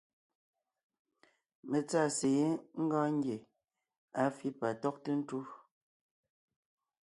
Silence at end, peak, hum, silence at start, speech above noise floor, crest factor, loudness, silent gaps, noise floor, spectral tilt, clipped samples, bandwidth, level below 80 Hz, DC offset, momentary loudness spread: 1.5 s; -18 dBFS; none; 1.65 s; 38 dB; 18 dB; -35 LUFS; 3.98-4.08 s; -72 dBFS; -5.5 dB/octave; under 0.1%; 11.5 kHz; -82 dBFS; under 0.1%; 12 LU